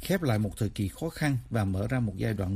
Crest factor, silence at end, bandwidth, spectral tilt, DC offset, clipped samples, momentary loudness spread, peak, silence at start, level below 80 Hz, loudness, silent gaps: 16 dB; 0 s; 15.5 kHz; -6.5 dB/octave; under 0.1%; under 0.1%; 4 LU; -12 dBFS; 0 s; -48 dBFS; -30 LUFS; none